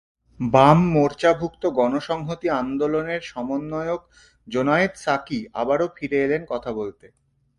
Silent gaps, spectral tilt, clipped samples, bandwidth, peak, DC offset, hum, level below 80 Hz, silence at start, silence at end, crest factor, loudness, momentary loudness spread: none; -7 dB/octave; under 0.1%; 11.5 kHz; 0 dBFS; under 0.1%; none; -52 dBFS; 0.4 s; 0.7 s; 22 dB; -22 LUFS; 12 LU